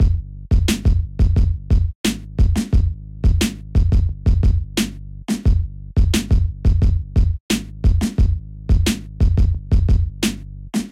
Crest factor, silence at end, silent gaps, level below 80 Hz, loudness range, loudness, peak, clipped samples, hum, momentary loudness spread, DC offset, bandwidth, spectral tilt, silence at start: 12 dB; 0 s; 1.95-2.04 s, 7.40-7.49 s; -20 dBFS; 1 LU; -20 LUFS; -4 dBFS; under 0.1%; none; 6 LU; 0.2%; 15.5 kHz; -6 dB/octave; 0 s